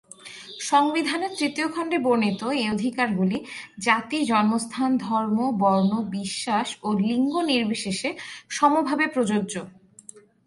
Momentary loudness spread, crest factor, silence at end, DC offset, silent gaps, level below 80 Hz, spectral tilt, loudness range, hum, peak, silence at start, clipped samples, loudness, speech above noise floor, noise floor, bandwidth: 11 LU; 20 dB; 0.25 s; under 0.1%; none; -66 dBFS; -4.5 dB/octave; 1 LU; none; -4 dBFS; 0.25 s; under 0.1%; -24 LUFS; 25 dB; -48 dBFS; 11.5 kHz